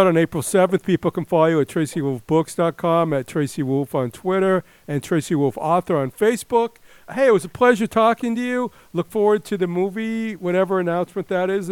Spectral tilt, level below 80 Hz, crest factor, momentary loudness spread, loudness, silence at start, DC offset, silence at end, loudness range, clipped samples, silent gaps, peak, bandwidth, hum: -6 dB/octave; -58 dBFS; 18 dB; 8 LU; -20 LUFS; 0 s; under 0.1%; 0 s; 2 LU; under 0.1%; none; -2 dBFS; 17.5 kHz; none